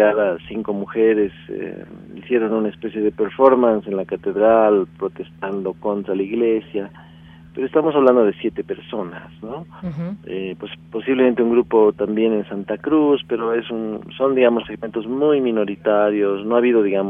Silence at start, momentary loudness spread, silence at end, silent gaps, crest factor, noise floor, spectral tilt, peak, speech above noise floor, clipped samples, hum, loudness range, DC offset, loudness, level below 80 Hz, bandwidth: 0 s; 15 LU; 0 s; none; 18 dB; -43 dBFS; -9 dB/octave; 0 dBFS; 24 dB; under 0.1%; none; 4 LU; under 0.1%; -19 LUFS; -56 dBFS; 3.8 kHz